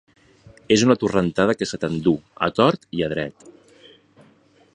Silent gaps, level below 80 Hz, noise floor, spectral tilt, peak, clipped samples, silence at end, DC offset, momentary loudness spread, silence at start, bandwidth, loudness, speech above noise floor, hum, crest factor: none; -52 dBFS; -55 dBFS; -5.5 dB/octave; -2 dBFS; under 0.1%; 1.25 s; under 0.1%; 8 LU; 0.7 s; 10 kHz; -21 LUFS; 35 dB; none; 22 dB